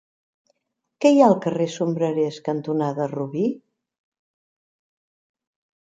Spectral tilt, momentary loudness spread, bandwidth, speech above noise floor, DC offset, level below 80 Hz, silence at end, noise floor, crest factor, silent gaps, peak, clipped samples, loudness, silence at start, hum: -7 dB/octave; 11 LU; 9.2 kHz; 57 dB; under 0.1%; -74 dBFS; 2.3 s; -77 dBFS; 22 dB; none; -2 dBFS; under 0.1%; -21 LUFS; 1 s; none